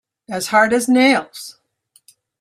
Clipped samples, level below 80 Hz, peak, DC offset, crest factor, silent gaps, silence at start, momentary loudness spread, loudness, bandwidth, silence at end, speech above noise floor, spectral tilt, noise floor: under 0.1%; -64 dBFS; -2 dBFS; under 0.1%; 18 dB; none; 0.3 s; 20 LU; -15 LUFS; 14.5 kHz; 0.9 s; 43 dB; -3 dB/octave; -59 dBFS